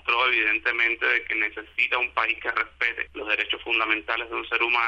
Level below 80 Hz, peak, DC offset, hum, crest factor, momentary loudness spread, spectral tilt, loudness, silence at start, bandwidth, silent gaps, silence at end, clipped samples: -56 dBFS; -8 dBFS; under 0.1%; none; 16 dB; 6 LU; -3 dB/octave; -23 LUFS; 0.05 s; 8.2 kHz; none; 0 s; under 0.1%